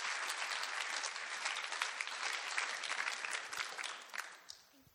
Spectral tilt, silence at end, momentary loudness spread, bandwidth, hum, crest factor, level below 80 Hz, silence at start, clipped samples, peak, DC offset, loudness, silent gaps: 2.5 dB/octave; 0.1 s; 8 LU; over 20 kHz; none; 22 dB; under -90 dBFS; 0 s; under 0.1%; -20 dBFS; under 0.1%; -39 LUFS; none